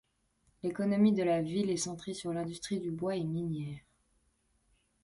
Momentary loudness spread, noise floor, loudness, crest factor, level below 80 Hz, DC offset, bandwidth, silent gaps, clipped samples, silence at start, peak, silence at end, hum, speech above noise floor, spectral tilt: 12 LU; -74 dBFS; -33 LUFS; 16 dB; -66 dBFS; under 0.1%; 11.5 kHz; none; under 0.1%; 0.65 s; -18 dBFS; 1.25 s; none; 42 dB; -6 dB/octave